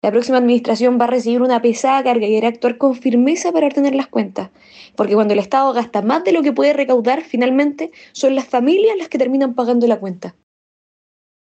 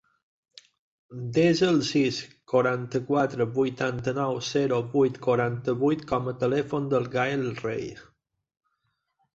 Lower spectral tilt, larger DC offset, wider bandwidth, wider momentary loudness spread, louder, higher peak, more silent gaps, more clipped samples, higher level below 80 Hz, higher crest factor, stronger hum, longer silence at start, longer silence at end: about the same, -5 dB/octave vs -6 dB/octave; neither; about the same, 8.6 kHz vs 8 kHz; about the same, 7 LU vs 8 LU; first, -16 LUFS vs -26 LUFS; first, -4 dBFS vs -10 dBFS; neither; neither; second, -70 dBFS vs -60 dBFS; second, 12 dB vs 18 dB; neither; second, 0.05 s vs 1.1 s; second, 1.15 s vs 1.3 s